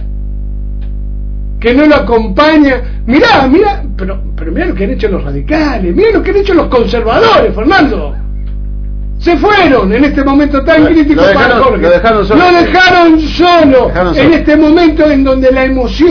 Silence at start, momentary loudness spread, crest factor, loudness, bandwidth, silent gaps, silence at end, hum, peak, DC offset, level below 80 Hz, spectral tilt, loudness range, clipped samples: 0 s; 16 LU; 8 dB; -7 LUFS; 5.4 kHz; none; 0 s; 50 Hz at -20 dBFS; 0 dBFS; under 0.1%; -18 dBFS; -7 dB/octave; 5 LU; 2%